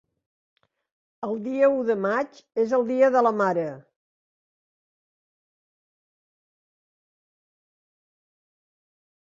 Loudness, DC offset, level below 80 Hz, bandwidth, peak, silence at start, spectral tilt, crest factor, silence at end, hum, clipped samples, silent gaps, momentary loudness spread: -23 LUFS; under 0.1%; -76 dBFS; 7.4 kHz; -8 dBFS; 1.2 s; -7 dB/octave; 20 dB; 5.55 s; none; under 0.1%; none; 12 LU